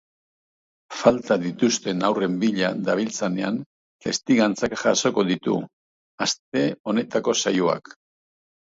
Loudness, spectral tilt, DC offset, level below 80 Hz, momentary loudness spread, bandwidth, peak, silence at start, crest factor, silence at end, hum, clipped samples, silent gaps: -23 LUFS; -4 dB/octave; under 0.1%; -62 dBFS; 8 LU; 8 kHz; -2 dBFS; 0.9 s; 22 dB; 0.85 s; none; under 0.1%; 3.66-4.00 s, 5.73-6.18 s, 6.39-6.52 s, 6.80-6.84 s